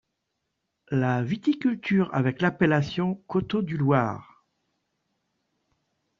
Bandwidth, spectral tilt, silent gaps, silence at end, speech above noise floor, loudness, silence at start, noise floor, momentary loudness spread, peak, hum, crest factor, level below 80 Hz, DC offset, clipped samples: 7.2 kHz; -6.5 dB/octave; none; 2 s; 55 dB; -25 LUFS; 0.9 s; -80 dBFS; 6 LU; -6 dBFS; none; 20 dB; -60 dBFS; under 0.1%; under 0.1%